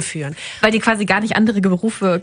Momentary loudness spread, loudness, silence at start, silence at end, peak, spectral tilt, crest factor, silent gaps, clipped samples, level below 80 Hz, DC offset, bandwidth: 10 LU; -17 LUFS; 0 s; 0 s; 0 dBFS; -5 dB/octave; 18 dB; none; under 0.1%; -50 dBFS; under 0.1%; 10.5 kHz